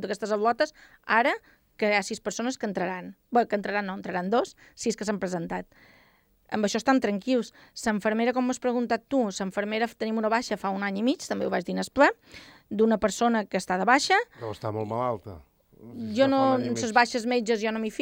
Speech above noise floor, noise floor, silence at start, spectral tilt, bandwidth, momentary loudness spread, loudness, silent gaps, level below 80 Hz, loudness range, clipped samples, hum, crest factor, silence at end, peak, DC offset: 36 dB; -63 dBFS; 0 s; -4.5 dB/octave; 16.5 kHz; 10 LU; -27 LUFS; none; -62 dBFS; 4 LU; under 0.1%; none; 22 dB; 0 s; -6 dBFS; under 0.1%